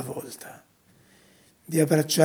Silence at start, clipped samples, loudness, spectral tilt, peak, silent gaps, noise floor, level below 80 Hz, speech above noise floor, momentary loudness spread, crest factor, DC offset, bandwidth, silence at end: 0 s; under 0.1%; -25 LUFS; -5 dB/octave; -4 dBFS; none; -59 dBFS; -74 dBFS; 35 dB; 20 LU; 24 dB; under 0.1%; over 20 kHz; 0 s